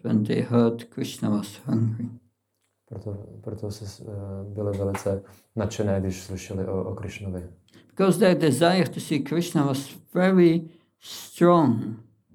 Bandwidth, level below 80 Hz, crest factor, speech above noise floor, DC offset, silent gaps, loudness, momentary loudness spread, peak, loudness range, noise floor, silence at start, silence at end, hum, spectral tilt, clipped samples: 17.5 kHz; -64 dBFS; 20 dB; 51 dB; under 0.1%; none; -24 LUFS; 18 LU; -4 dBFS; 11 LU; -75 dBFS; 0.05 s; 0.35 s; none; -6.5 dB/octave; under 0.1%